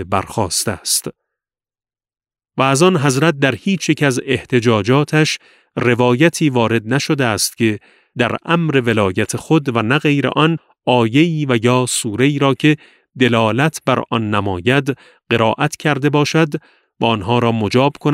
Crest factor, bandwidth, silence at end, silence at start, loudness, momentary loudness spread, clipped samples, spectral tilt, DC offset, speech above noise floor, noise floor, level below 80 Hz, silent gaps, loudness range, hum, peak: 16 dB; 16 kHz; 0 s; 0 s; -16 LUFS; 6 LU; under 0.1%; -5 dB/octave; under 0.1%; over 75 dB; under -90 dBFS; -54 dBFS; none; 2 LU; none; 0 dBFS